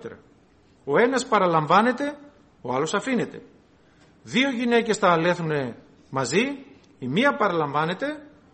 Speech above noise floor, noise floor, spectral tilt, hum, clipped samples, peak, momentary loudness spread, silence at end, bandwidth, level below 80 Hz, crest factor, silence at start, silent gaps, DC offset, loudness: 34 dB; -57 dBFS; -5 dB/octave; none; under 0.1%; -4 dBFS; 15 LU; 0.3 s; 8.8 kHz; -64 dBFS; 20 dB; 0 s; none; under 0.1%; -23 LUFS